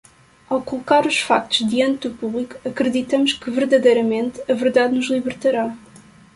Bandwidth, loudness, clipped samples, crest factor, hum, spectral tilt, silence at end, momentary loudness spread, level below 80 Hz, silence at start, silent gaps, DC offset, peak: 11.5 kHz; -19 LUFS; under 0.1%; 18 dB; none; -4 dB/octave; 0.4 s; 10 LU; -58 dBFS; 0.5 s; none; under 0.1%; -2 dBFS